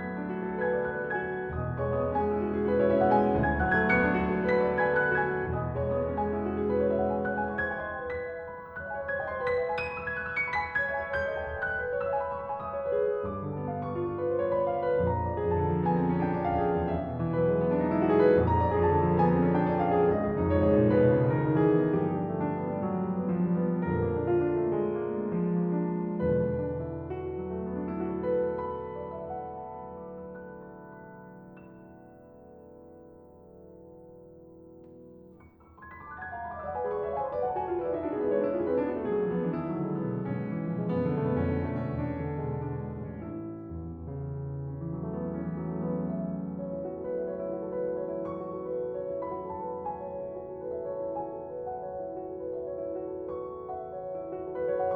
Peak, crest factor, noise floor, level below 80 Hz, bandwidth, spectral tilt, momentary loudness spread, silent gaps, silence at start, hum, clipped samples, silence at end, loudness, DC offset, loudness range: -10 dBFS; 18 dB; -54 dBFS; -50 dBFS; 5.4 kHz; -10.5 dB/octave; 13 LU; none; 0 s; none; under 0.1%; 0 s; -30 LUFS; under 0.1%; 11 LU